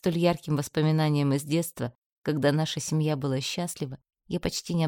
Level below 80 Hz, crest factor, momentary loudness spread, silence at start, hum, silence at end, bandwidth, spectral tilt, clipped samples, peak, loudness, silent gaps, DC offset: -56 dBFS; 18 dB; 12 LU; 0.05 s; none; 0 s; 17.5 kHz; -5.5 dB/octave; under 0.1%; -8 dBFS; -28 LUFS; 1.95-2.22 s; under 0.1%